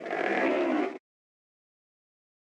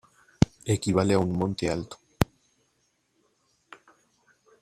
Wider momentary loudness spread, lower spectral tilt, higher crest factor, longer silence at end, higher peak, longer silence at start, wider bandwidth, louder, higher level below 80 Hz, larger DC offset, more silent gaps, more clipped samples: first, 10 LU vs 7 LU; about the same, -5.5 dB/octave vs -6 dB/octave; second, 18 dB vs 26 dB; second, 1.45 s vs 2.4 s; second, -14 dBFS vs -2 dBFS; second, 0 s vs 0.4 s; second, 9.2 kHz vs 16 kHz; about the same, -28 LUFS vs -27 LUFS; second, -86 dBFS vs -48 dBFS; neither; neither; neither